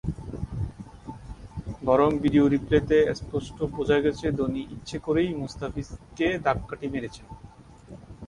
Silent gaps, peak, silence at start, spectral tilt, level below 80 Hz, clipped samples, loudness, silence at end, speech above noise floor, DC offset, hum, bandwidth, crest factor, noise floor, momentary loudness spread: none; -8 dBFS; 0.05 s; -7 dB/octave; -44 dBFS; under 0.1%; -26 LUFS; 0 s; 22 dB; under 0.1%; none; 11 kHz; 20 dB; -47 dBFS; 20 LU